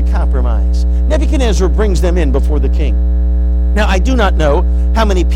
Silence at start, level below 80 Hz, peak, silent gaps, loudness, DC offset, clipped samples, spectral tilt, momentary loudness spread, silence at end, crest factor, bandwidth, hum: 0 s; -12 dBFS; -2 dBFS; none; -13 LUFS; under 0.1%; under 0.1%; -6.5 dB/octave; 2 LU; 0 s; 10 dB; 9 kHz; 60 Hz at -10 dBFS